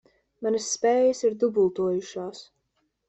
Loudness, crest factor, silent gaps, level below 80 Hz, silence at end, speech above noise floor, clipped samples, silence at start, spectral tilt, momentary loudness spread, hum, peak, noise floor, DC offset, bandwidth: -25 LUFS; 16 dB; none; -68 dBFS; 0.65 s; 50 dB; under 0.1%; 0.4 s; -4 dB/octave; 14 LU; none; -10 dBFS; -74 dBFS; under 0.1%; 8.4 kHz